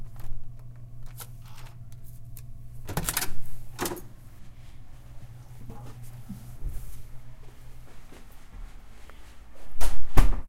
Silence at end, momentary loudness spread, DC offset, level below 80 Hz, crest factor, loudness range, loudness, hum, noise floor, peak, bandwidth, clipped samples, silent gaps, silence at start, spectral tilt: 0.05 s; 22 LU; under 0.1%; -34 dBFS; 22 dB; 10 LU; -37 LUFS; none; -42 dBFS; 0 dBFS; 16.5 kHz; under 0.1%; none; 0 s; -4 dB/octave